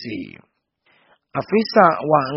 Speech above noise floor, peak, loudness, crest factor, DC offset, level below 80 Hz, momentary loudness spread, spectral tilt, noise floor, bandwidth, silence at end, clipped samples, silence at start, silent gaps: 43 dB; 0 dBFS; -17 LUFS; 20 dB; under 0.1%; -62 dBFS; 17 LU; -4.5 dB/octave; -62 dBFS; 6 kHz; 0 s; under 0.1%; 0 s; none